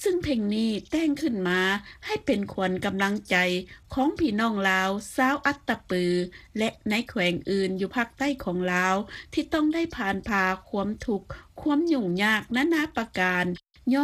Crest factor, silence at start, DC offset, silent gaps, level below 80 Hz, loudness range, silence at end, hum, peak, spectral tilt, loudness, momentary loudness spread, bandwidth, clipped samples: 18 dB; 0 s; under 0.1%; none; -52 dBFS; 2 LU; 0 s; none; -8 dBFS; -5 dB/octave; -26 LUFS; 7 LU; 15.5 kHz; under 0.1%